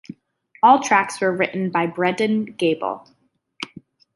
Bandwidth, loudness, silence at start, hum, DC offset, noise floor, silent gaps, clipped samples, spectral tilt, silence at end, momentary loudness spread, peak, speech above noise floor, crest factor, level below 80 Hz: 11.5 kHz; -19 LUFS; 0.1 s; none; under 0.1%; -56 dBFS; none; under 0.1%; -5 dB/octave; 0.5 s; 19 LU; -2 dBFS; 37 dB; 20 dB; -70 dBFS